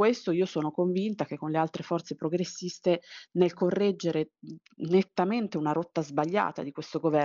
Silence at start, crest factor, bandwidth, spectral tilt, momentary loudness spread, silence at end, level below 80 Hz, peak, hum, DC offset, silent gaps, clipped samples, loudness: 0 s; 18 dB; 7.4 kHz; -6 dB/octave; 8 LU; 0 s; -74 dBFS; -10 dBFS; none; under 0.1%; none; under 0.1%; -29 LUFS